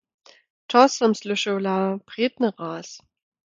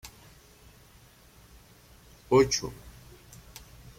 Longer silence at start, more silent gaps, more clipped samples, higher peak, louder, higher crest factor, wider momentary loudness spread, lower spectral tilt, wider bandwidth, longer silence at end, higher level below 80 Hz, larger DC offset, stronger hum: first, 0.7 s vs 0.05 s; neither; neither; first, -2 dBFS vs -10 dBFS; first, -22 LUFS vs -26 LUFS; about the same, 22 dB vs 24 dB; second, 15 LU vs 28 LU; about the same, -4.5 dB/octave vs -4 dB/octave; second, 9 kHz vs 16.5 kHz; second, 0.6 s vs 1.1 s; second, -74 dBFS vs -54 dBFS; neither; neither